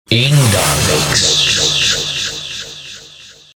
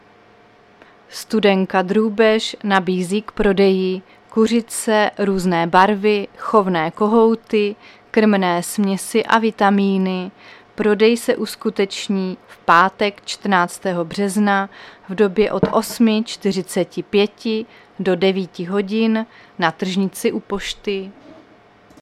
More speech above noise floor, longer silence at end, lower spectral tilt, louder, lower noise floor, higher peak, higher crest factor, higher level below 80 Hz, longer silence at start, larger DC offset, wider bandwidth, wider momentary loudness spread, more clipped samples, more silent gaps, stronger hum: second, 27 dB vs 32 dB; second, 0.25 s vs 0.7 s; second, -3 dB/octave vs -5 dB/octave; first, -12 LUFS vs -18 LUFS; second, -39 dBFS vs -49 dBFS; about the same, 0 dBFS vs 0 dBFS; about the same, 14 dB vs 18 dB; first, -36 dBFS vs -48 dBFS; second, 0.1 s vs 1.1 s; neither; first, over 20 kHz vs 15 kHz; first, 18 LU vs 10 LU; neither; neither; neither